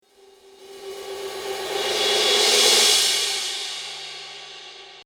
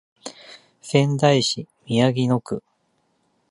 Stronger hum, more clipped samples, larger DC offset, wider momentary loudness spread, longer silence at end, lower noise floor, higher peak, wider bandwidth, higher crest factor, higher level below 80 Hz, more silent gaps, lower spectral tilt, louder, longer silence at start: neither; neither; neither; first, 23 LU vs 20 LU; second, 0.05 s vs 0.9 s; second, -52 dBFS vs -68 dBFS; about the same, -4 dBFS vs -2 dBFS; first, over 20 kHz vs 11.5 kHz; about the same, 20 dB vs 20 dB; about the same, -64 dBFS vs -62 dBFS; neither; second, 1.5 dB/octave vs -5.5 dB/octave; first, -18 LUFS vs -21 LUFS; first, 0.6 s vs 0.25 s